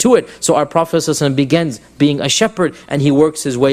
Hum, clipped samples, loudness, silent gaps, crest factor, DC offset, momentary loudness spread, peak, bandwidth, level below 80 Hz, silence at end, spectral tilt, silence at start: none; under 0.1%; -15 LUFS; none; 14 dB; under 0.1%; 4 LU; 0 dBFS; 15.5 kHz; -48 dBFS; 0 s; -4.5 dB/octave; 0 s